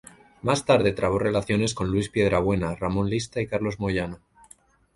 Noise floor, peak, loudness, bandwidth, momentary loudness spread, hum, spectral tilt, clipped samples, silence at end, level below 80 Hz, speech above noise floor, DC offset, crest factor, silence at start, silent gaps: -56 dBFS; -6 dBFS; -25 LUFS; 11.5 kHz; 7 LU; none; -5.5 dB/octave; under 0.1%; 0.8 s; -44 dBFS; 32 dB; under 0.1%; 20 dB; 0.45 s; none